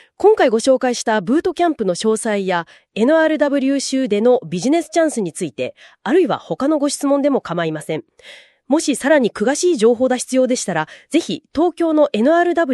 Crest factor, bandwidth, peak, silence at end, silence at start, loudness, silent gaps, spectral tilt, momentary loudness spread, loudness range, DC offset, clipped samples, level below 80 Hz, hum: 14 dB; 12.5 kHz; -2 dBFS; 0 s; 0.2 s; -17 LUFS; none; -4.5 dB/octave; 8 LU; 2 LU; under 0.1%; under 0.1%; -58 dBFS; none